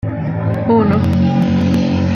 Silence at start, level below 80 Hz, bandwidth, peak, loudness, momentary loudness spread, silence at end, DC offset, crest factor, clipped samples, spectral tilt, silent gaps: 0.05 s; -42 dBFS; 7 kHz; -2 dBFS; -14 LUFS; 6 LU; 0 s; under 0.1%; 12 dB; under 0.1%; -8.5 dB/octave; none